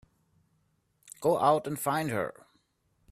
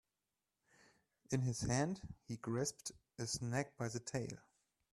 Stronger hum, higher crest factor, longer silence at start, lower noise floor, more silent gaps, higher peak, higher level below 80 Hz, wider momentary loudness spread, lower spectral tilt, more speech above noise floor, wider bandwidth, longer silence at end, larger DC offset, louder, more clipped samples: neither; about the same, 22 dB vs 22 dB; second, 1.05 s vs 1.3 s; second, -73 dBFS vs under -90 dBFS; neither; first, -10 dBFS vs -22 dBFS; about the same, -70 dBFS vs -66 dBFS; second, 9 LU vs 12 LU; about the same, -5 dB/octave vs -5 dB/octave; second, 45 dB vs over 49 dB; first, 15.5 kHz vs 13 kHz; first, 0.8 s vs 0.55 s; neither; first, -29 LUFS vs -42 LUFS; neither